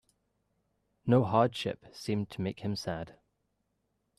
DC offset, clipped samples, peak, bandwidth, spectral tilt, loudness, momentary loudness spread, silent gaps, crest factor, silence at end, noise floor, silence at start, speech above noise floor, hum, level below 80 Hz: under 0.1%; under 0.1%; -12 dBFS; 13.5 kHz; -7 dB/octave; -32 LUFS; 14 LU; none; 22 dB; 1.1 s; -79 dBFS; 1.05 s; 49 dB; none; -66 dBFS